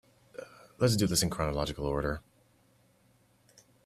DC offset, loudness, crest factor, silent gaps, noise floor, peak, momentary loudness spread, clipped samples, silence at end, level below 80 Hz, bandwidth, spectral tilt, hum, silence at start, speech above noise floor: under 0.1%; -30 LUFS; 20 dB; none; -66 dBFS; -14 dBFS; 21 LU; under 0.1%; 1.65 s; -48 dBFS; 15 kHz; -4.5 dB/octave; none; 0.35 s; 37 dB